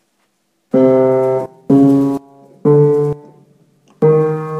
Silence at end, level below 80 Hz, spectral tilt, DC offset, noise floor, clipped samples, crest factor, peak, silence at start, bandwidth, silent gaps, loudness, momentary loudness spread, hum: 0 s; -58 dBFS; -10.5 dB/octave; under 0.1%; -64 dBFS; under 0.1%; 14 dB; 0 dBFS; 0.75 s; 8.2 kHz; none; -13 LUFS; 10 LU; none